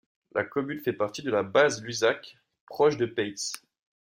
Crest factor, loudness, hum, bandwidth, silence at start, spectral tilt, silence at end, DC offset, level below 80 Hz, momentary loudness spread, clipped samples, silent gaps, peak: 20 dB; -27 LUFS; none; 16.5 kHz; 0.35 s; -4 dB/octave; 0.55 s; under 0.1%; -70 dBFS; 11 LU; under 0.1%; 2.60-2.67 s; -8 dBFS